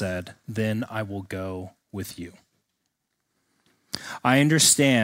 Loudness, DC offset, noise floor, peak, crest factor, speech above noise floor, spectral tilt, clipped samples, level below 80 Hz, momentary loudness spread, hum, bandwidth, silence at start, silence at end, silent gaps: -23 LUFS; under 0.1%; -78 dBFS; -4 dBFS; 22 dB; 54 dB; -3.5 dB/octave; under 0.1%; -62 dBFS; 21 LU; none; 16 kHz; 0 s; 0 s; none